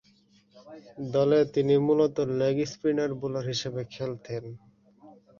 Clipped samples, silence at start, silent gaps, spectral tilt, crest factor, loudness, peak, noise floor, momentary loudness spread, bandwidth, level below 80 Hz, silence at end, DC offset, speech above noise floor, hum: under 0.1%; 0.55 s; none; -6.5 dB/octave; 16 dB; -27 LUFS; -12 dBFS; -62 dBFS; 15 LU; 7.4 kHz; -64 dBFS; 0.3 s; under 0.1%; 36 dB; none